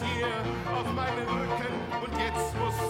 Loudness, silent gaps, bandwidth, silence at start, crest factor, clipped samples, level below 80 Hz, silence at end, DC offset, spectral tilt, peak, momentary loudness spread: -31 LUFS; none; 16.5 kHz; 0 s; 14 dB; under 0.1%; -46 dBFS; 0 s; under 0.1%; -5 dB/octave; -16 dBFS; 2 LU